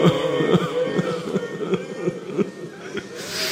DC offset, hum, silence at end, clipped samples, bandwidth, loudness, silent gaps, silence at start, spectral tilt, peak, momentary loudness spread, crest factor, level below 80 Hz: under 0.1%; none; 0 s; under 0.1%; 16 kHz; -24 LUFS; none; 0 s; -5.5 dB/octave; -4 dBFS; 12 LU; 20 dB; -58 dBFS